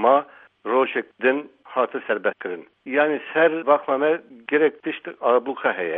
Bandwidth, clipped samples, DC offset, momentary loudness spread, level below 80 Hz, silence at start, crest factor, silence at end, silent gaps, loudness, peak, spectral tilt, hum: 3.9 kHz; under 0.1%; under 0.1%; 11 LU; -78 dBFS; 0 s; 18 dB; 0 s; none; -22 LUFS; -4 dBFS; -8 dB/octave; none